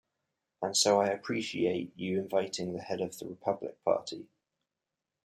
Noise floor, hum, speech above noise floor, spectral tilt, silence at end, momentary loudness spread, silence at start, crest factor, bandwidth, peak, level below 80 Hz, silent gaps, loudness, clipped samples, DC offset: -89 dBFS; none; 57 dB; -3.5 dB/octave; 1 s; 11 LU; 0.6 s; 20 dB; 15.5 kHz; -12 dBFS; -76 dBFS; none; -32 LUFS; under 0.1%; under 0.1%